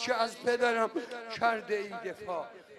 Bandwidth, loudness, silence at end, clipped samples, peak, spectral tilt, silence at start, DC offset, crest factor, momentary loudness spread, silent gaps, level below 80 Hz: 13 kHz; -32 LUFS; 0 s; under 0.1%; -14 dBFS; -3 dB/octave; 0 s; under 0.1%; 18 dB; 11 LU; none; -74 dBFS